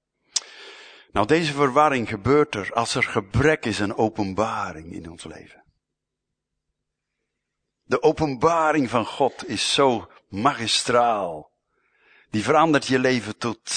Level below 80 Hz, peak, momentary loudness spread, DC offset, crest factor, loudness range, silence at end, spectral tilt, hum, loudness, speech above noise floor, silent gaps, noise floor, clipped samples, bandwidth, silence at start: -50 dBFS; -4 dBFS; 16 LU; under 0.1%; 20 dB; 9 LU; 0 s; -4.5 dB/octave; none; -22 LUFS; 61 dB; none; -83 dBFS; under 0.1%; 9.6 kHz; 0.35 s